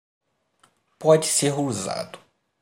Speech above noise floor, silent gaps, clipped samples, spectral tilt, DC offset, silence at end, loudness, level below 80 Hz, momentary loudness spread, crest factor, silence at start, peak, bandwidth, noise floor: 42 dB; none; under 0.1%; -4 dB/octave; under 0.1%; 0.45 s; -22 LUFS; -68 dBFS; 14 LU; 22 dB; 1 s; -4 dBFS; 16 kHz; -64 dBFS